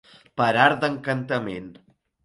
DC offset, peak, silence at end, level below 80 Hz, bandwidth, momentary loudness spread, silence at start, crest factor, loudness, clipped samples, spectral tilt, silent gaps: under 0.1%; -2 dBFS; 0.5 s; -62 dBFS; 11.5 kHz; 17 LU; 0.35 s; 22 dB; -22 LUFS; under 0.1%; -6 dB/octave; none